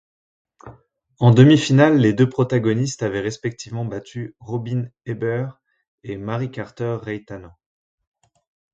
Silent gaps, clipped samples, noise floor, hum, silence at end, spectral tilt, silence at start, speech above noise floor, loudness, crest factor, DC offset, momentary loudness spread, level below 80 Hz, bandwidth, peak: 5.88-5.98 s; under 0.1%; -47 dBFS; none; 1.25 s; -7 dB/octave; 0.65 s; 29 dB; -19 LUFS; 20 dB; under 0.1%; 19 LU; -56 dBFS; 7.8 kHz; 0 dBFS